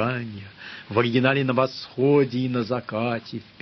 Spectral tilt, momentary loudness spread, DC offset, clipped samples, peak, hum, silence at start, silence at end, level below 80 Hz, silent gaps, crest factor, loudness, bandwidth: -8 dB/octave; 17 LU; under 0.1%; under 0.1%; -6 dBFS; none; 0 s; 0.2 s; -60 dBFS; none; 18 dB; -23 LUFS; 6.2 kHz